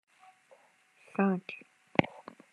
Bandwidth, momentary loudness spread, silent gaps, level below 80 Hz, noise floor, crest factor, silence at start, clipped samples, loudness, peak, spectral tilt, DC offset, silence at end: 9.6 kHz; 17 LU; none; -74 dBFS; -65 dBFS; 30 dB; 1.2 s; under 0.1%; -32 LUFS; -4 dBFS; -8 dB/octave; under 0.1%; 0.45 s